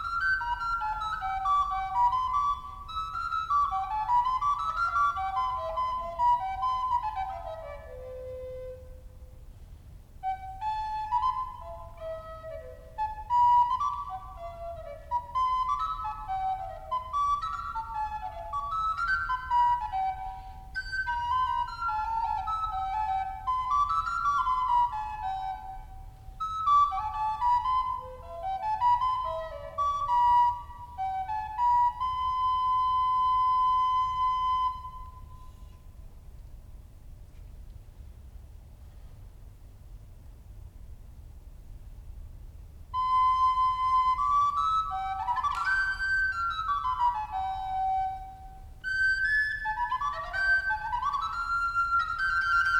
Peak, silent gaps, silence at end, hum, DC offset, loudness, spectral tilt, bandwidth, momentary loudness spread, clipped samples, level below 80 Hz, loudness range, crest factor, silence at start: -16 dBFS; none; 0 s; none; under 0.1%; -28 LUFS; -3 dB/octave; 11.5 kHz; 16 LU; under 0.1%; -48 dBFS; 8 LU; 14 dB; 0 s